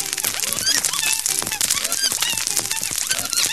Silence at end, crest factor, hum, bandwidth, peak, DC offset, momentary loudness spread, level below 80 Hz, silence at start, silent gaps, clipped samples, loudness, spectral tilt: 0 s; 22 dB; none; 16 kHz; 0 dBFS; 0.4%; 3 LU; -52 dBFS; 0 s; none; under 0.1%; -19 LUFS; 1 dB/octave